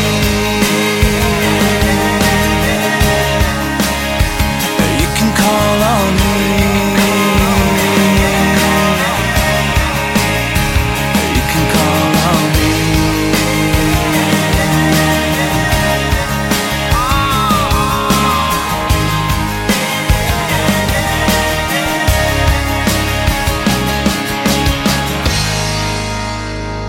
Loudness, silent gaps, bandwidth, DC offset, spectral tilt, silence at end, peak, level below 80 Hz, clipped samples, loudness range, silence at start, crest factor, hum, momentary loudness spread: -13 LUFS; none; 17 kHz; under 0.1%; -4.5 dB/octave; 0 s; 0 dBFS; -22 dBFS; under 0.1%; 2 LU; 0 s; 12 dB; none; 3 LU